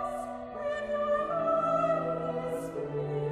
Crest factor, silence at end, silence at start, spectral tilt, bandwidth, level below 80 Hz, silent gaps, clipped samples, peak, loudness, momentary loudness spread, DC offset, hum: 14 dB; 0 s; 0 s; -7 dB/octave; 13.5 kHz; -60 dBFS; none; under 0.1%; -16 dBFS; -31 LUFS; 8 LU; under 0.1%; none